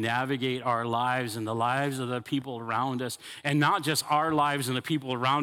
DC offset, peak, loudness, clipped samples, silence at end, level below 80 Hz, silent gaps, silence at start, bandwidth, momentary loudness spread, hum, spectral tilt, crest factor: under 0.1%; -10 dBFS; -28 LUFS; under 0.1%; 0 s; -72 dBFS; none; 0 s; 17 kHz; 8 LU; none; -4.5 dB/octave; 18 dB